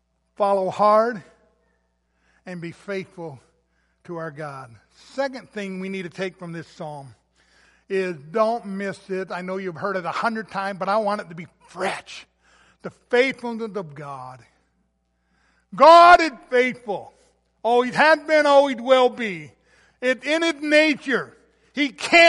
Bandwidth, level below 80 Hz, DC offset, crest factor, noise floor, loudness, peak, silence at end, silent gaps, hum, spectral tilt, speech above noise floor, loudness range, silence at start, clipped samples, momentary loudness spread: 11.5 kHz; -62 dBFS; under 0.1%; 20 dB; -70 dBFS; -20 LUFS; -2 dBFS; 0 s; none; none; -4.5 dB/octave; 49 dB; 16 LU; 0.4 s; under 0.1%; 21 LU